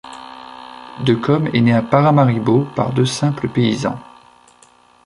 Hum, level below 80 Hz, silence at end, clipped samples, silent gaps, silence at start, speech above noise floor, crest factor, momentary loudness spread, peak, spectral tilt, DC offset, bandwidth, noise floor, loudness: none; -52 dBFS; 1.05 s; under 0.1%; none; 0.05 s; 35 dB; 16 dB; 21 LU; -2 dBFS; -7 dB/octave; under 0.1%; 11.5 kHz; -50 dBFS; -16 LUFS